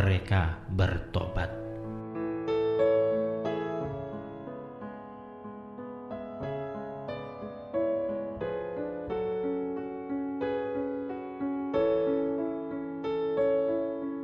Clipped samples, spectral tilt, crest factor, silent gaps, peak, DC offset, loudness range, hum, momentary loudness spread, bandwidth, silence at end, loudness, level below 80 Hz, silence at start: under 0.1%; -9 dB/octave; 16 dB; none; -14 dBFS; under 0.1%; 9 LU; none; 15 LU; 6.8 kHz; 0 s; -32 LUFS; -48 dBFS; 0 s